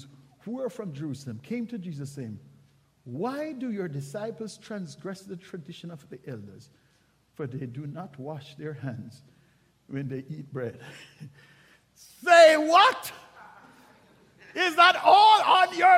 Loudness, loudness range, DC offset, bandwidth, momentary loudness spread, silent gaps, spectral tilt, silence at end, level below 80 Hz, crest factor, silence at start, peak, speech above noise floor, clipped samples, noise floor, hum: -23 LUFS; 19 LU; under 0.1%; 15.5 kHz; 25 LU; none; -4 dB/octave; 0 s; -74 dBFS; 22 dB; 0.45 s; -6 dBFS; 41 dB; under 0.1%; -66 dBFS; none